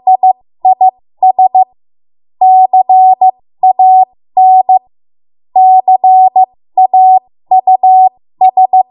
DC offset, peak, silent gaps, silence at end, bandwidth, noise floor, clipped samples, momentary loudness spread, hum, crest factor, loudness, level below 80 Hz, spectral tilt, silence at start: under 0.1%; 0 dBFS; none; 0.1 s; 2.4 kHz; under -90 dBFS; under 0.1%; 6 LU; none; 8 dB; -8 LUFS; -68 dBFS; -6 dB/octave; 0.05 s